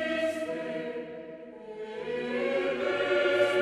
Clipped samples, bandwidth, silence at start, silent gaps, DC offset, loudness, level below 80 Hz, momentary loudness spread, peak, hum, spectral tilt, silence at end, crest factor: under 0.1%; 13 kHz; 0 s; none; under 0.1%; -30 LUFS; -68 dBFS; 17 LU; -12 dBFS; none; -4.5 dB/octave; 0 s; 18 dB